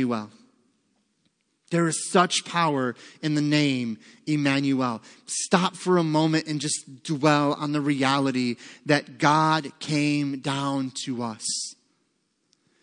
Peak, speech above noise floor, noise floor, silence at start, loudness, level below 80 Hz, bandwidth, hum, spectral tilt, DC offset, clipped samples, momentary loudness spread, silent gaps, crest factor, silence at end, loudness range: -2 dBFS; 48 dB; -72 dBFS; 0 s; -24 LUFS; -76 dBFS; 10.5 kHz; none; -4.5 dB/octave; under 0.1%; under 0.1%; 10 LU; none; 22 dB; 1.1 s; 3 LU